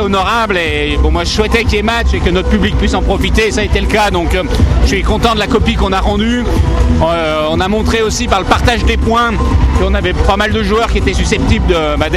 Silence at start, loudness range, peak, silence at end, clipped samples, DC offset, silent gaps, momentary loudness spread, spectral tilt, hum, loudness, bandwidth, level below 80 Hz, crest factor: 0 s; 0 LU; 0 dBFS; 0 s; under 0.1%; under 0.1%; none; 2 LU; -5.5 dB/octave; none; -12 LUFS; 13 kHz; -16 dBFS; 12 dB